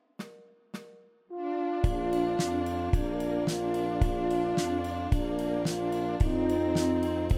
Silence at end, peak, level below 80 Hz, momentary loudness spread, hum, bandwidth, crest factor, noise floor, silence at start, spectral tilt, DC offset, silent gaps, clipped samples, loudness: 0 s; -12 dBFS; -36 dBFS; 18 LU; none; 15.5 kHz; 18 dB; -54 dBFS; 0.2 s; -6.5 dB/octave; under 0.1%; none; under 0.1%; -29 LUFS